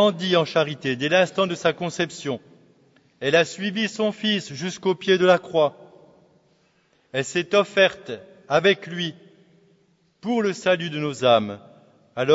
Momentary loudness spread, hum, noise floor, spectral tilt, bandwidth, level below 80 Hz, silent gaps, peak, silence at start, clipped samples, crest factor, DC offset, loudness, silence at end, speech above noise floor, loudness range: 12 LU; none; -63 dBFS; -4.5 dB/octave; 8 kHz; -68 dBFS; none; -4 dBFS; 0 s; under 0.1%; 20 dB; under 0.1%; -22 LUFS; 0 s; 41 dB; 3 LU